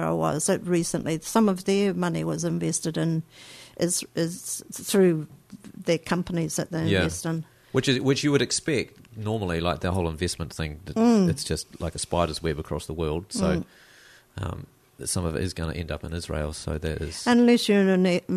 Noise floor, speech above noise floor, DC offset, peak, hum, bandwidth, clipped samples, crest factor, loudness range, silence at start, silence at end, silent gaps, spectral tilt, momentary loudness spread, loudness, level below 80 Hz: -53 dBFS; 28 dB; under 0.1%; -8 dBFS; none; 13.5 kHz; under 0.1%; 18 dB; 5 LU; 0 s; 0 s; none; -5 dB/octave; 12 LU; -26 LUFS; -44 dBFS